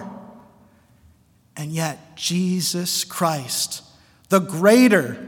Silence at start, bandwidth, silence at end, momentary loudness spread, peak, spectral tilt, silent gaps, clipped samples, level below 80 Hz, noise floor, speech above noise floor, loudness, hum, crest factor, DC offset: 0 s; 18 kHz; 0 s; 20 LU; -2 dBFS; -4 dB/octave; none; under 0.1%; -66 dBFS; -56 dBFS; 36 dB; -20 LUFS; none; 20 dB; under 0.1%